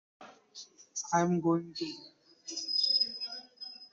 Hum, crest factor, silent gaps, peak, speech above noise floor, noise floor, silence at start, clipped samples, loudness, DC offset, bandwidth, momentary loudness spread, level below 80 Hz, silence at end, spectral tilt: none; 18 dB; none; -16 dBFS; 22 dB; -53 dBFS; 0.2 s; under 0.1%; -31 LUFS; under 0.1%; 7.8 kHz; 22 LU; -78 dBFS; 0.05 s; -4 dB/octave